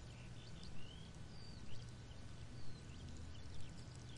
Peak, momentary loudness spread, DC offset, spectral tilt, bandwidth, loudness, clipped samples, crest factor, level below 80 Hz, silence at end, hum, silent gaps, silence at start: -34 dBFS; 1 LU; 0.2%; -5 dB/octave; 11 kHz; -55 LUFS; under 0.1%; 14 dB; -60 dBFS; 0 s; none; none; 0 s